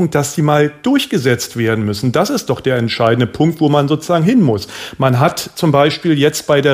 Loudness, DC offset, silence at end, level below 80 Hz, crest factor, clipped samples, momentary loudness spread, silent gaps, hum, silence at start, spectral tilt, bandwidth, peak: -14 LUFS; under 0.1%; 0 s; -50 dBFS; 14 dB; under 0.1%; 4 LU; none; none; 0 s; -5.5 dB/octave; 15.5 kHz; 0 dBFS